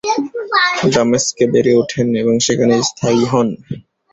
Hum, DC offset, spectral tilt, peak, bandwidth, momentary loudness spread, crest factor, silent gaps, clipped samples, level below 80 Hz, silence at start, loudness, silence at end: none; under 0.1%; -4 dB/octave; -2 dBFS; 8.2 kHz; 7 LU; 14 dB; none; under 0.1%; -50 dBFS; 0.05 s; -14 LUFS; 0.35 s